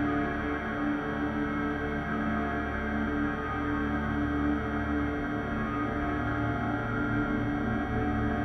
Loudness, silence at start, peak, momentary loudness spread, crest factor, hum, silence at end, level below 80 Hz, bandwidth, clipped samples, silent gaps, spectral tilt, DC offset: -30 LUFS; 0 s; -16 dBFS; 2 LU; 14 dB; none; 0 s; -42 dBFS; 6.2 kHz; under 0.1%; none; -8 dB/octave; under 0.1%